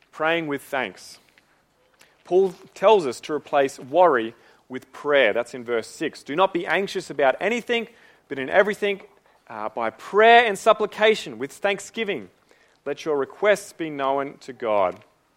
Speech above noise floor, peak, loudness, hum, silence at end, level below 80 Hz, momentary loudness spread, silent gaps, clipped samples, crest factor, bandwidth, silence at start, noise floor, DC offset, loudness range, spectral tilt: 40 dB; -2 dBFS; -22 LUFS; none; 0.4 s; -70 dBFS; 15 LU; none; under 0.1%; 20 dB; 16 kHz; 0.15 s; -63 dBFS; under 0.1%; 5 LU; -4 dB/octave